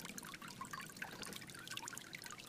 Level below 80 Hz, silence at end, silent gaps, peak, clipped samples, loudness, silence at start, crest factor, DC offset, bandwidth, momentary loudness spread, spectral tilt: -74 dBFS; 0 s; none; -26 dBFS; under 0.1%; -49 LUFS; 0 s; 24 dB; under 0.1%; 15.5 kHz; 3 LU; -2 dB/octave